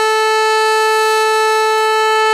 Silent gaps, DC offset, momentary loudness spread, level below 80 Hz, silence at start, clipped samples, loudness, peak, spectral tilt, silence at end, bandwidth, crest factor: none; under 0.1%; 1 LU; -70 dBFS; 0 s; under 0.1%; -12 LUFS; -4 dBFS; 2.5 dB/octave; 0 s; 16 kHz; 10 dB